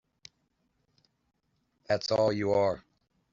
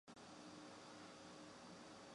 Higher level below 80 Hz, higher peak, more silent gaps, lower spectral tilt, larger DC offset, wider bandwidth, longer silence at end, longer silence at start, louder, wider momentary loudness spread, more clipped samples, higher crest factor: first, -66 dBFS vs -86 dBFS; first, -14 dBFS vs -46 dBFS; neither; about the same, -4.5 dB/octave vs -3.5 dB/octave; neither; second, 7.6 kHz vs 11 kHz; first, 0.55 s vs 0 s; first, 1.9 s vs 0.05 s; first, -28 LUFS vs -58 LUFS; first, 6 LU vs 1 LU; neither; first, 18 dB vs 12 dB